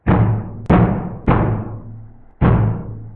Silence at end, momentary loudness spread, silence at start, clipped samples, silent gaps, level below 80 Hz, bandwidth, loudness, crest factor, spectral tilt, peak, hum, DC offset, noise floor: 0 s; 14 LU; 0.05 s; under 0.1%; none; -28 dBFS; 3.9 kHz; -17 LUFS; 16 dB; -11.5 dB/octave; 0 dBFS; none; under 0.1%; -37 dBFS